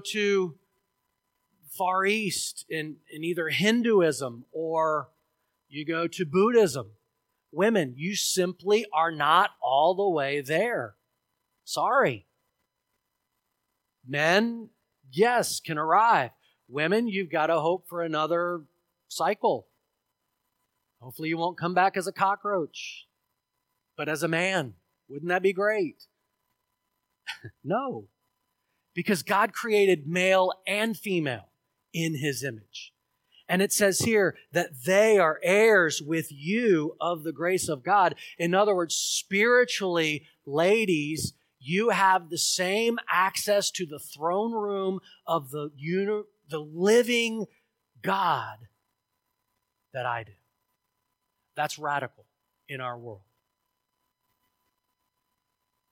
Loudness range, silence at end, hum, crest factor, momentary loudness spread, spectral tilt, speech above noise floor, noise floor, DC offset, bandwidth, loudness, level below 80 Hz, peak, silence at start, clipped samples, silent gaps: 10 LU; 2.75 s; none; 20 dB; 15 LU; -4 dB/octave; 54 dB; -80 dBFS; under 0.1%; 17 kHz; -26 LUFS; -74 dBFS; -8 dBFS; 0.05 s; under 0.1%; none